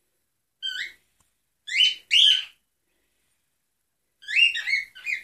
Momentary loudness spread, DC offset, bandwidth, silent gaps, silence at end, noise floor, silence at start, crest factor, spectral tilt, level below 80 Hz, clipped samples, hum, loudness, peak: 17 LU; under 0.1%; 14.5 kHz; none; 0 s; -78 dBFS; 0.6 s; 20 dB; 5.5 dB/octave; -78 dBFS; under 0.1%; none; -20 LUFS; -6 dBFS